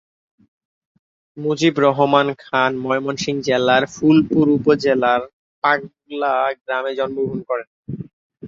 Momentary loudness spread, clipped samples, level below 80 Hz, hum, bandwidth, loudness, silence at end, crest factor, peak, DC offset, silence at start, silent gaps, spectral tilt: 12 LU; under 0.1%; -58 dBFS; none; 7.6 kHz; -18 LUFS; 0 s; 18 dB; -2 dBFS; under 0.1%; 1.35 s; 5.33-5.62 s, 6.61-6.65 s, 7.67-7.83 s, 8.13-8.30 s; -5.5 dB/octave